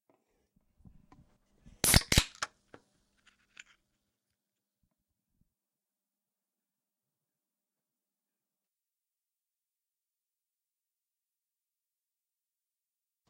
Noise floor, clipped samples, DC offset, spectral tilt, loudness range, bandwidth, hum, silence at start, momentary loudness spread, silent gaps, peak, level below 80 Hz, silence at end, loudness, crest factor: under -90 dBFS; under 0.1%; under 0.1%; -2.5 dB/octave; 10 LU; 16 kHz; none; 1.85 s; 17 LU; none; -8 dBFS; -48 dBFS; 10.85 s; -28 LUFS; 32 dB